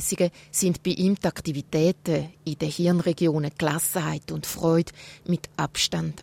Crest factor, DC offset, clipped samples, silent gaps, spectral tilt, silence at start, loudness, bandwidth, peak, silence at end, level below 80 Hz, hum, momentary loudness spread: 16 dB; under 0.1%; under 0.1%; none; -5 dB/octave; 0 s; -25 LUFS; 16.5 kHz; -8 dBFS; 0 s; -54 dBFS; none; 7 LU